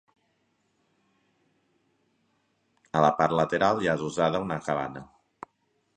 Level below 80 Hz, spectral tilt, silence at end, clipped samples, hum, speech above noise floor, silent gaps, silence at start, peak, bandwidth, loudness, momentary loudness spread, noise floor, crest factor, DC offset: -62 dBFS; -6 dB/octave; 0.95 s; under 0.1%; none; 47 dB; none; 2.95 s; -6 dBFS; 10 kHz; -26 LUFS; 8 LU; -73 dBFS; 24 dB; under 0.1%